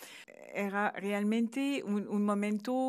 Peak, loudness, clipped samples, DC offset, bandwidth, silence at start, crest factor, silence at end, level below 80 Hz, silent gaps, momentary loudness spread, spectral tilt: -18 dBFS; -33 LUFS; under 0.1%; under 0.1%; 14.5 kHz; 0 s; 16 dB; 0 s; under -90 dBFS; none; 9 LU; -6 dB/octave